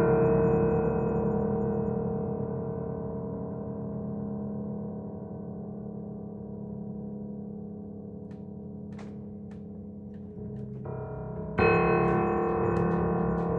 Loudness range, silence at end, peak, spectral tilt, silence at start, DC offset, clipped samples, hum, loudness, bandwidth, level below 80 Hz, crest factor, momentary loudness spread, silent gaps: 13 LU; 0 s; -12 dBFS; -10.5 dB/octave; 0 s; under 0.1%; under 0.1%; none; -30 LUFS; 4.4 kHz; -48 dBFS; 18 dB; 17 LU; none